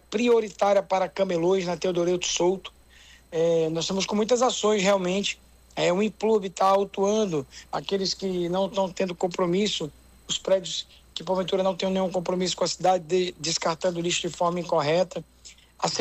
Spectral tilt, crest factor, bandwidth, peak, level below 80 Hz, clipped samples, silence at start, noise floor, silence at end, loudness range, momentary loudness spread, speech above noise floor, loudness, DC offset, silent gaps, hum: -4 dB/octave; 16 dB; 14.5 kHz; -10 dBFS; -58 dBFS; under 0.1%; 0.1 s; -52 dBFS; 0 s; 3 LU; 8 LU; 28 dB; -25 LUFS; under 0.1%; none; none